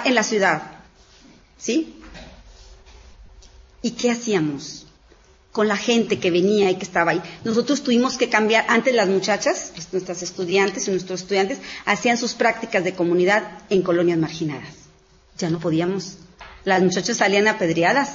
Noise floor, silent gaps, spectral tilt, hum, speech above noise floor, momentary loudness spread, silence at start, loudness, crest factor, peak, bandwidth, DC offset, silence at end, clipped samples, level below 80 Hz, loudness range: -53 dBFS; none; -4 dB/octave; none; 33 dB; 12 LU; 0 s; -20 LUFS; 18 dB; -2 dBFS; 7.8 kHz; under 0.1%; 0 s; under 0.1%; -54 dBFS; 9 LU